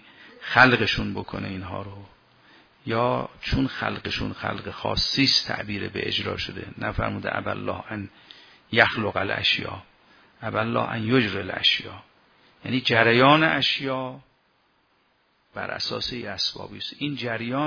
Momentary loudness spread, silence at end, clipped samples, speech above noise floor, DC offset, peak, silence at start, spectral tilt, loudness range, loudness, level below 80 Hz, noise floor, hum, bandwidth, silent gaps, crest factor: 18 LU; 0 s; under 0.1%; 41 dB; under 0.1%; 0 dBFS; 0.2 s; -5 dB/octave; 8 LU; -23 LUFS; -48 dBFS; -66 dBFS; none; 5.4 kHz; none; 24 dB